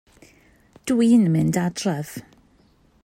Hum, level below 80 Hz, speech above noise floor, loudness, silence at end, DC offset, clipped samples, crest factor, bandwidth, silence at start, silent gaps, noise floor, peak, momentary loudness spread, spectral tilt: none; -58 dBFS; 39 dB; -20 LUFS; 0.85 s; under 0.1%; under 0.1%; 16 dB; 16 kHz; 0.85 s; none; -58 dBFS; -8 dBFS; 19 LU; -6.5 dB/octave